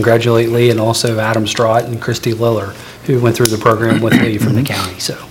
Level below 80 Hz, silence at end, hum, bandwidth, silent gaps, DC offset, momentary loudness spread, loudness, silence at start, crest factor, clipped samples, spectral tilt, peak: -46 dBFS; 0 s; none; over 20 kHz; none; under 0.1%; 8 LU; -13 LUFS; 0 s; 14 dB; 0.3%; -5.5 dB/octave; 0 dBFS